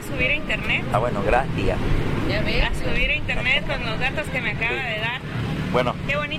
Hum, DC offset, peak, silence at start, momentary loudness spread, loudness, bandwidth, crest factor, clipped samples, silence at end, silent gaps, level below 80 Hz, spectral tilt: none; under 0.1%; -6 dBFS; 0 s; 4 LU; -23 LUFS; 14 kHz; 16 dB; under 0.1%; 0 s; none; -30 dBFS; -5.5 dB/octave